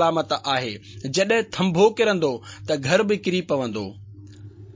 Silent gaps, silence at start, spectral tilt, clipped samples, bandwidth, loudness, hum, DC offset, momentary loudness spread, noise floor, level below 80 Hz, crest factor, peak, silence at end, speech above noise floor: none; 0 s; -5 dB/octave; under 0.1%; 7.6 kHz; -22 LUFS; none; under 0.1%; 14 LU; -42 dBFS; -56 dBFS; 18 dB; -4 dBFS; 0.05 s; 20 dB